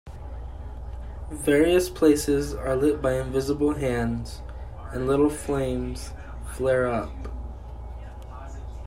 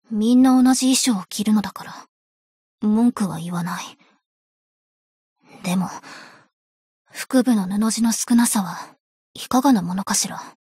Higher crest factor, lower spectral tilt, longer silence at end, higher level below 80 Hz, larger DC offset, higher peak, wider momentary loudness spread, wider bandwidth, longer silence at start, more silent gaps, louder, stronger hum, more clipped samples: about the same, 18 dB vs 14 dB; first, -6 dB/octave vs -4 dB/octave; second, 0 s vs 0.15 s; first, -38 dBFS vs -62 dBFS; neither; about the same, -6 dBFS vs -6 dBFS; about the same, 19 LU vs 19 LU; about the same, 16 kHz vs 16 kHz; about the same, 0.05 s vs 0.1 s; second, none vs 2.09-2.78 s, 4.26-5.36 s, 6.53-7.05 s, 9.00-9.34 s; second, -24 LUFS vs -19 LUFS; neither; neither